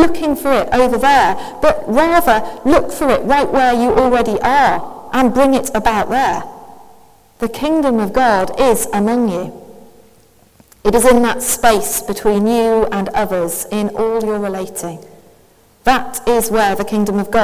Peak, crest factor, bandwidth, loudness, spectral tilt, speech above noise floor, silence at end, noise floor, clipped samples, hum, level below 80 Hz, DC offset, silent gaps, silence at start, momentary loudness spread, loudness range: 0 dBFS; 14 dB; 16 kHz; -14 LUFS; -4 dB/octave; 36 dB; 0 s; -49 dBFS; under 0.1%; none; -36 dBFS; under 0.1%; none; 0 s; 8 LU; 5 LU